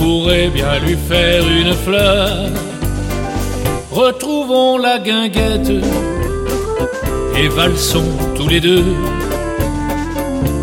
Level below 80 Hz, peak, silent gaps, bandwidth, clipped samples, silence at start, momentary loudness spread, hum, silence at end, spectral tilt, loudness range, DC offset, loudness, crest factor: -24 dBFS; 0 dBFS; none; 17 kHz; under 0.1%; 0 s; 8 LU; none; 0 s; -5 dB/octave; 1 LU; under 0.1%; -15 LUFS; 14 dB